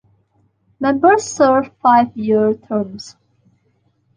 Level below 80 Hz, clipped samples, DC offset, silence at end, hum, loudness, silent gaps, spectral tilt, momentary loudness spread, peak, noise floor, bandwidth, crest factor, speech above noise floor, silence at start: -58 dBFS; under 0.1%; under 0.1%; 1.1 s; none; -15 LUFS; none; -5 dB/octave; 12 LU; -2 dBFS; -62 dBFS; 10 kHz; 16 dB; 47 dB; 0.8 s